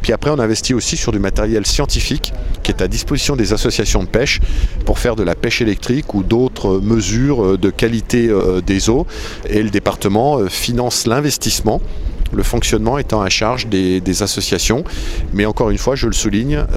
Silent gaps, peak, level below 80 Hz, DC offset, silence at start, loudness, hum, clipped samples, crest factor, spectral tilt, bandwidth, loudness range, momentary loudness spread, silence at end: none; 0 dBFS; -22 dBFS; under 0.1%; 0 s; -16 LUFS; none; under 0.1%; 14 dB; -4.5 dB/octave; 16 kHz; 2 LU; 5 LU; 0 s